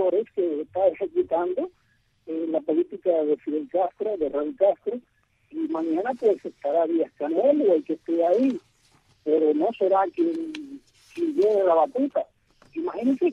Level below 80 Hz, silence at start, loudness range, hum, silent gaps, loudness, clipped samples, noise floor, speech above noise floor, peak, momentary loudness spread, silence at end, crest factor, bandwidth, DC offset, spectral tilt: -68 dBFS; 0 s; 3 LU; none; none; -24 LUFS; under 0.1%; -61 dBFS; 38 dB; -8 dBFS; 12 LU; 0 s; 16 dB; 7.2 kHz; under 0.1%; -7 dB/octave